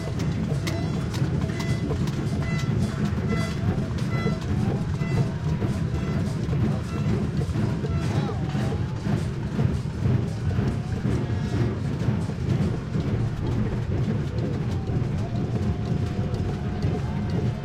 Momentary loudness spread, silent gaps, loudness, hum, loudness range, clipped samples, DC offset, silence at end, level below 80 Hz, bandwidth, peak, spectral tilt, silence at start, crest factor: 2 LU; none; -26 LUFS; none; 1 LU; under 0.1%; under 0.1%; 0 s; -36 dBFS; 12 kHz; -10 dBFS; -7.5 dB/octave; 0 s; 14 dB